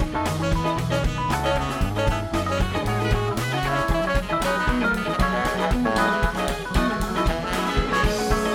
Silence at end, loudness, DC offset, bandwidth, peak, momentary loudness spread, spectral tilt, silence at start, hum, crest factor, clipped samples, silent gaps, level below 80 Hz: 0 s; -23 LUFS; under 0.1%; 17.5 kHz; -8 dBFS; 3 LU; -5.5 dB/octave; 0 s; none; 16 dB; under 0.1%; none; -30 dBFS